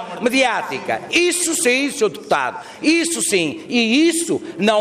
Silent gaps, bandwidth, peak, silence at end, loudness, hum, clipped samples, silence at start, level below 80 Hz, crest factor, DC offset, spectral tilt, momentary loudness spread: none; 15.5 kHz; -4 dBFS; 0 s; -18 LUFS; none; under 0.1%; 0 s; -62 dBFS; 14 dB; under 0.1%; -2.5 dB/octave; 7 LU